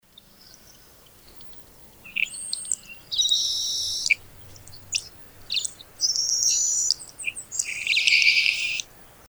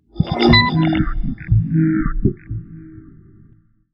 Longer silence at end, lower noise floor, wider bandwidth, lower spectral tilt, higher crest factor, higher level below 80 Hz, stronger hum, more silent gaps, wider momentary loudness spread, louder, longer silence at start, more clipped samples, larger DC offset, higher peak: second, 0.25 s vs 0.95 s; about the same, -52 dBFS vs -51 dBFS; first, over 20 kHz vs 5.8 kHz; second, 3 dB/octave vs -8.5 dB/octave; first, 26 dB vs 18 dB; second, -58 dBFS vs -28 dBFS; neither; neither; second, 14 LU vs 19 LU; second, -22 LUFS vs -17 LUFS; first, 1.25 s vs 0.15 s; neither; neither; about the same, 0 dBFS vs -2 dBFS